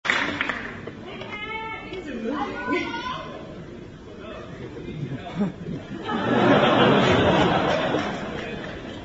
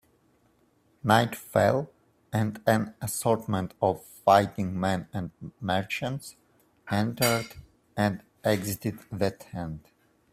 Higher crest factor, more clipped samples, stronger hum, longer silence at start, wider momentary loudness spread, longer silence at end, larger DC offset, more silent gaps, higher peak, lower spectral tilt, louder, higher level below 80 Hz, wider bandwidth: about the same, 20 dB vs 24 dB; neither; neither; second, 0.05 s vs 1.05 s; first, 20 LU vs 14 LU; second, 0 s vs 0.55 s; neither; neither; about the same, -4 dBFS vs -4 dBFS; about the same, -6 dB/octave vs -5 dB/octave; first, -24 LUFS vs -28 LUFS; first, -48 dBFS vs -60 dBFS; second, 8 kHz vs 16 kHz